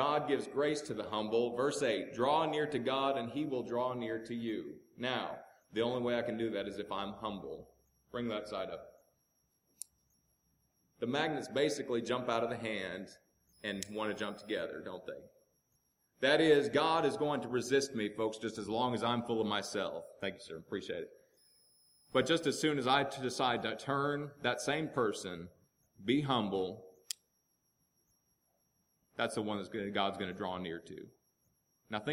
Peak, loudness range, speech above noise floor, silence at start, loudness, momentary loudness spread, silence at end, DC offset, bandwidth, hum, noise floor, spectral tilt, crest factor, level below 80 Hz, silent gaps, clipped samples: -14 dBFS; 9 LU; 44 dB; 0 s; -35 LUFS; 14 LU; 0 s; under 0.1%; 16.5 kHz; none; -79 dBFS; -4.5 dB/octave; 22 dB; -72 dBFS; none; under 0.1%